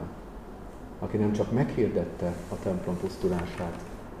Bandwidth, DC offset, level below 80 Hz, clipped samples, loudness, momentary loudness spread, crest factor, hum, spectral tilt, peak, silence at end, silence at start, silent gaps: 15 kHz; 0.1%; -46 dBFS; under 0.1%; -30 LUFS; 17 LU; 16 dB; none; -8 dB/octave; -14 dBFS; 0 s; 0 s; none